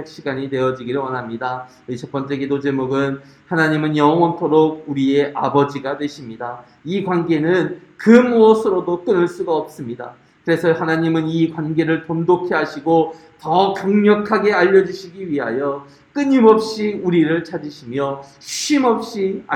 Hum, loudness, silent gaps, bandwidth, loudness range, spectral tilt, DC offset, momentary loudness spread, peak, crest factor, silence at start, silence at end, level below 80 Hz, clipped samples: none; -17 LUFS; none; 13 kHz; 4 LU; -6 dB/octave; under 0.1%; 16 LU; 0 dBFS; 18 dB; 0 s; 0 s; -60 dBFS; under 0.1%